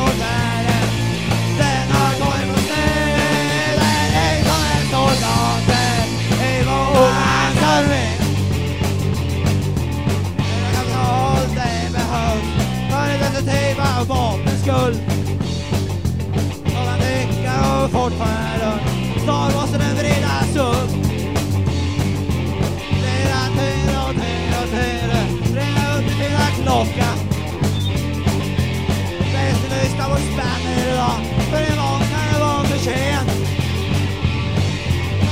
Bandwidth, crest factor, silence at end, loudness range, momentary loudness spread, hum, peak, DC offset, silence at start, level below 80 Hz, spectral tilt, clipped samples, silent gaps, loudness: 16 kHz; 16 dB; 0 s; 3 LU; 5 LU; none; -2 dBFS; 1%; 0 s; -30 dBFS; -5.5 dB/octave; under 0.1%; none; -18 LUFS